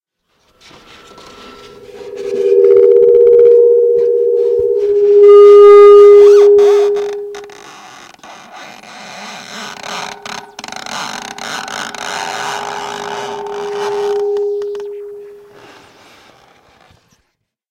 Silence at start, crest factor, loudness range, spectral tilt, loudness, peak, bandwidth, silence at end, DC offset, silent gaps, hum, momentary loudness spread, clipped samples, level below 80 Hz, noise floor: 1.95 s; 12 dB; 20 LU; -3.5 dB/octave; -8 LUFS; 0 dBFS; 9.6 kHz; 2.4 s; under 0.1%; none; none; 24 LU; 1%; -54 dBFS; -67 dBFS